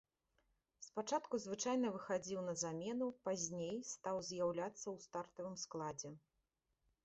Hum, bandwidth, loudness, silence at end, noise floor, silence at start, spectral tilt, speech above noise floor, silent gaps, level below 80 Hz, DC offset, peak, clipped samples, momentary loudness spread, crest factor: none; 8 kHz; -44 LUFS; 0.85 s; -87 dBFS; 0.8 s; -5 dB/octave; 44 dB; none; -80 dBFS; under 0.1%; -26 dBFS; under 0.1%; 9 LU; 18 dB